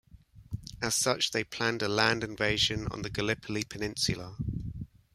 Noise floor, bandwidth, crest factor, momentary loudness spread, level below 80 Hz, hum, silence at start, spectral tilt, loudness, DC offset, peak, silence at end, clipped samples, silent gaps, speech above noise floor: -53 dBFS; 15.5 kHz; 24 dB; 14 LU; -50 dBFS; none; 0.15 s; -3 dB/octave; -30 LUFS; under 0.1%; -8 dBFS; 0.3 s; under 0.1%; none; 22 dB